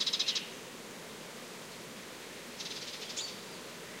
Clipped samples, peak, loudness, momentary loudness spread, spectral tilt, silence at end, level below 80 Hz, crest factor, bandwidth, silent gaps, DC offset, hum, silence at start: under 0.1%; -18 dBFS; -39 LUFS; 13 LU; -1 dB/octave; 0 s; -78 dBFS; 24 dB; 16 kHz; none; under 0.1%; none; 0 s